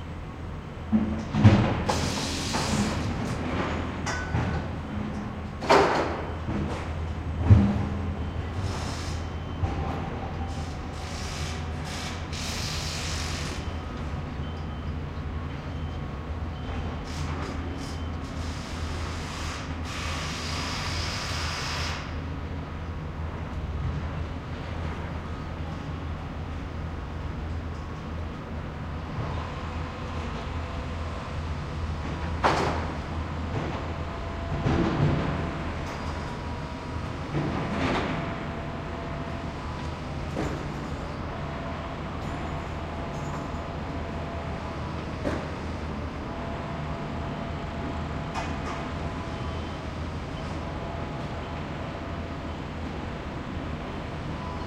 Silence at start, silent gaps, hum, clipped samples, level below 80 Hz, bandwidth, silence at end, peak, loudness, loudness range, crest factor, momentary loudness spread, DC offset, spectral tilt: 0 s; none; none; under 0.1%; -40 dBFS; 14.5 kHz; 0 s; -4 dBFS; -31 LUFS; 9 LU; 26 dB; 8 LU; under 0.1%; -5.5 dB/octave